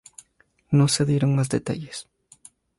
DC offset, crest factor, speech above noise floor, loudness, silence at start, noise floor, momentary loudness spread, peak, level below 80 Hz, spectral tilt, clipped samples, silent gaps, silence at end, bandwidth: under 0.1%; 16 dB; 42 dB; -22 LUFS; 0.7 s; -63 dBFS; 15 LU; -8 dBFS; -58 dBFS; -5.5 dB/octave; under 0.1%; none; 0.75 s; 11.5 kHz